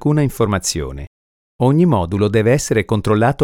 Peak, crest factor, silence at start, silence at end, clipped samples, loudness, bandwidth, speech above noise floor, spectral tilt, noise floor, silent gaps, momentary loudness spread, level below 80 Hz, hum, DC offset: -2 dBFS; 14 dB; 0 s; 0 s; under 0.1%; -16 LUFS; 16.5 kHz; over 75 dB; -6 dB/octave; under -90 dBFS; 1.07-1.59 s; 8 LU; -38 dBFS; none; under 0.1%